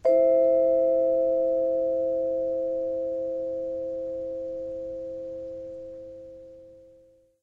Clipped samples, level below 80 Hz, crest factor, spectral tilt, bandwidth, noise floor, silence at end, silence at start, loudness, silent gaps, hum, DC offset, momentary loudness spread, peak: under 0.1%; -60 dBFS; 14 dB; -8.5 dB/octave; 2.4 kHz; -58 dBFS; 0.65 s; 0.05 s; -26 LUFS; none; none; under 0.1%; 19 LU; -12 dBFS